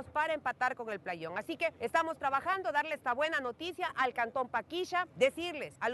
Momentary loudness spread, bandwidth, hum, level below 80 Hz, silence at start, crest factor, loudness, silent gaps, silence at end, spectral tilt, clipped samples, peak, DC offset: 8 LU; 12 kHz; none; -72 dBFS; 0 s; 18 dB; -34 LUFS; none; 0 s; -3.5 dB/octave; under 0.1%; -16 dBFS; under 0.1%